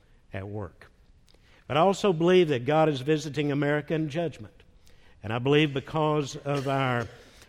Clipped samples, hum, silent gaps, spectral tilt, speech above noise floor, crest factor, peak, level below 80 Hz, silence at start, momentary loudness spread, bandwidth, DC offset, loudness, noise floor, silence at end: under 0.1%; none; none; -6.5 dB/octave; 32 dB; 18 dB; -8 dBFS; -58 dBFS; 0.35 s; 17 LU; 12.5 kHz; under 0.1%; -26 LUFS; -57 dBFS; 0.3 s